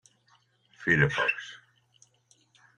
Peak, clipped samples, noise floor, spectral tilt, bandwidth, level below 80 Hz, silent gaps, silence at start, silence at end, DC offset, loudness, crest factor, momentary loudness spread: -8 dBFS; under 0.1%; -66 dBFS; -5.5 dB/octave; 9.8 kHz; -60 dBFS; none; 0.8 s; 1.2 s; under 0.1%; -26 LUFS; 24 dB; 15 LU